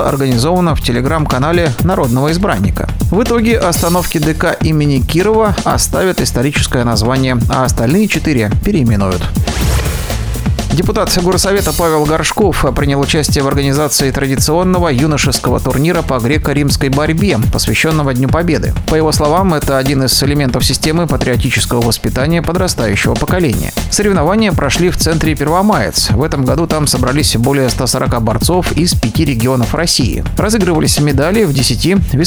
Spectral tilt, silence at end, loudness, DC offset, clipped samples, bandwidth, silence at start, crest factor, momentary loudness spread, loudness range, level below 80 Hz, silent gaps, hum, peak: -5 dB/octave; 0 s; -12 LUFS; under 0.1%; under 0.1%; over 20 kHz; 0 s; 12 dB; 3 LU; 1 LU; -22 dBFS; none; none; 0 dBFS